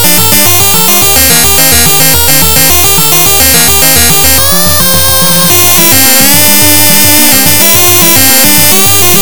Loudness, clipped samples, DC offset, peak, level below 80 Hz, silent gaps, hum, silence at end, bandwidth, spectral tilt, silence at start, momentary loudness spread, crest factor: -2 LUFS; 10%; 20%; 0 dBFS; -28 dBFS; none; none; 0 s; over 20 kHz; -1.5 dB/octave; 0 s; 2 LU; 6 dB